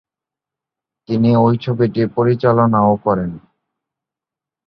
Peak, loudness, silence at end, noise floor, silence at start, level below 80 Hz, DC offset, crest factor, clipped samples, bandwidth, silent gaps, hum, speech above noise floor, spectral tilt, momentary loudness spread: -2 dBFS; -15 LUFS; 1.3 s; -87 dBFS; 1.1 s; -50 dBFS; under 0.1%; 16 dB; under 0.1%; 5.6 kHz; none; none; 73 dB; -10.5 dB/octave; 7 LU